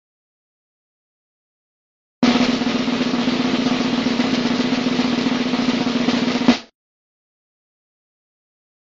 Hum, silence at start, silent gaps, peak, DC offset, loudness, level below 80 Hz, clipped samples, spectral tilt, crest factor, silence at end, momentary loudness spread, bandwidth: none; 2.2 s; none; 0 dBFS; under 0.1%; -19 LUFS; -52 dBFS; under 0.1%; -4.5 dB/octave; 22 dB; 2.35 s; 3 LU; 7.8 kHz